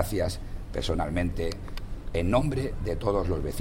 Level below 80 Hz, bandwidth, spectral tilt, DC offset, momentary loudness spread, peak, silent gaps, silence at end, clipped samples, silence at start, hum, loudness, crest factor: -34 dBFS; 16.5 kHz; -6.5 dB/octave; under 0.1%; 12 LU; -12 dBFS; none; 0 s; under 0.1%; 0 s; none; -30 LUFS; 16 dB